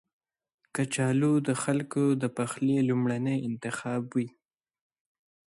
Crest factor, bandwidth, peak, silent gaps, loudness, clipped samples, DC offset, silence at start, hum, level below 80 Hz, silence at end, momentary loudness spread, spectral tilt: 14 dB; 11.5 kHz; -14 dBFS; none; -29 LUFS; under 0.1%; under 0.1%; 0.75 s; none; -72 dBFS; 1.3 s; 8 LU; -6 dB/octave